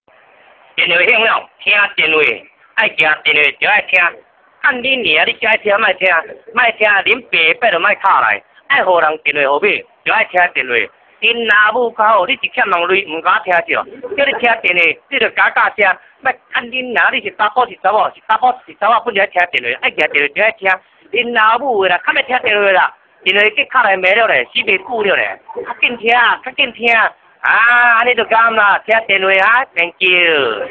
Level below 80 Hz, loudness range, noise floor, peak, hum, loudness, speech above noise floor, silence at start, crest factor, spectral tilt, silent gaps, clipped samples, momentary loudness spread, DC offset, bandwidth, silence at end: -58 dBFS; 3 LU; -47 dBFS; 0 dBFS; none; -12 LUFS; 34 dB; 0.75 s; 14 dB; -4.5 dB/octave; none; under 0.1%; 7 LU; under 0.1%; 8 kHz; 0 s